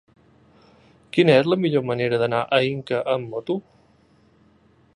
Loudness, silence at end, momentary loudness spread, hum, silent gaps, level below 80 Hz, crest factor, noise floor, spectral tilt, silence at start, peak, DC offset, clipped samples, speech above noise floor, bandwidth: -21 LUFS; 1.35 s; 11 LU; none; none; -64 dBFS; 20 dB; -57 dBFS; -7 dB/octave; 1.15 s; -2 dBFS; under 0.1%; under 0.1%; 37 dB; 11 kHz